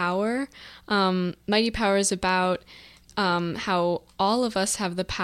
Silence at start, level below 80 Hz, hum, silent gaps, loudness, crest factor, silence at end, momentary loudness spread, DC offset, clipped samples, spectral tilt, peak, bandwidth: 0 s; -50 dBFS; none; none; -25 LUFS; 16 dB; 0 s; 7 LU; under 0.1%; under 0.1%; -4 dB/octave; -8 dBFS; 15 kHz